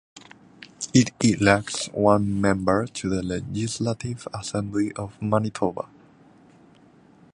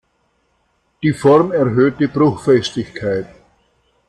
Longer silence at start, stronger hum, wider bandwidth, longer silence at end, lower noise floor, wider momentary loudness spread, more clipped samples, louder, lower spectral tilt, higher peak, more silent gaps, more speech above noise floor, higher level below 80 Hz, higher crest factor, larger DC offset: second, 0.15 s vs 1 s; neither; about the same, 11 kHz vs 11 kHz; first, 1.45 s vs 0.85 s; second, -54 dBFS vs -64 dBFS; about the same, 11 LU vs 11 LU; neither; second, -24 LUFS vs -16 LUFS; second, -5.5 dB/octave vs -7 dB/octave; about the same, -2 dBFS vs -2 dBFS; neither; second, 30 dB vs 49 dB; about the same, -50 dBFS vs -52 dBFS; first, 22 dB vs 16 dB; neither